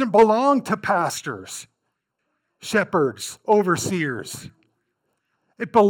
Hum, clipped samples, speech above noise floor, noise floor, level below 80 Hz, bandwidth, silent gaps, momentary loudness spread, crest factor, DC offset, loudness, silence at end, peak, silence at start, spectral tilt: none; under 0.1%; 56 dB; -77 dBFS; -62 dBFS; 18 kHz; none; 19 LU; 18 dB; under 0.1%; -21 LUFS; 0 s; -4 dBFS; 0 s; -5 dB/octave